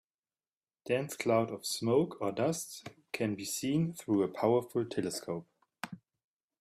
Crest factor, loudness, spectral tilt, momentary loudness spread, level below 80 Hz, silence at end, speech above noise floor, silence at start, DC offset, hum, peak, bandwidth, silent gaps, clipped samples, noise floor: 18 dB; -33 LUFS; -5 dB/octave; 16 LU; -72 dBFS; 0.65 s; over 58 dB; 0.85 s; under 0.1%; none; -16 dBFS; 15.5 kHz; none; under 0.1%; under -90 dBFS